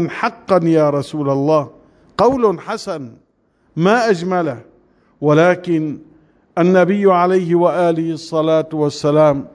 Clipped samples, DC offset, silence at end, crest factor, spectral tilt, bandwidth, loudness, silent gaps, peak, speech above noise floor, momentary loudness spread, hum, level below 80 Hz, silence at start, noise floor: under 0.1%; under 0.1%; 0.05 s; 14 dB; -7 dB/octave; 11 kHz; -16 LUFS; none; -2 dBFS; 44 dB; 13 LU; none; -54 dBFS; 0 s; -59 dBFS